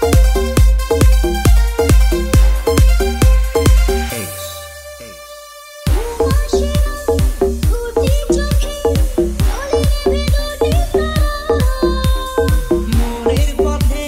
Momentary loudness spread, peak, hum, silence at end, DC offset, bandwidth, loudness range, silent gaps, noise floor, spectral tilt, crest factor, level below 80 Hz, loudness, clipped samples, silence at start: 10 LU; 0 dBFS; none; 0 s; under 0.1%; 16.5 kHz; 5 LU; none; -34 dBFS; -6 dB/octave; 14 dB; -16 dBFS; -15 LUFS; under 0.1%; 0 s